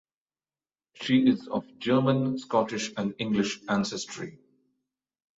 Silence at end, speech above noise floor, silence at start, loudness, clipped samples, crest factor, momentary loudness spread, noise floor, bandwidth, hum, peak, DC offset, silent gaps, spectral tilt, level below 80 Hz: 1.05 s; over 63 dB; 1 s; -27 LUFS; under 0.1%; 18 dB; 13 LU; under -90 dBFS; 8 kHz; none; -10 dBFS; under 0.1%; none; -5.5 dB/octave; -66 dBFS